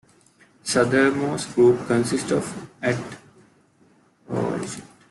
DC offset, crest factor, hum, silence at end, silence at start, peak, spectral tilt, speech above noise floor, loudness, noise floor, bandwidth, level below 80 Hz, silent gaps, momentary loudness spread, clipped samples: under 0.1%; 20 dB; none; 0.3 s; 0.65 s; -4 dBFS; -5 dB/octave; 37 dB; -22 LUFS; -58 dBFS; 12 kHz; -60 dBFS; none; 16 LU; under 0.1%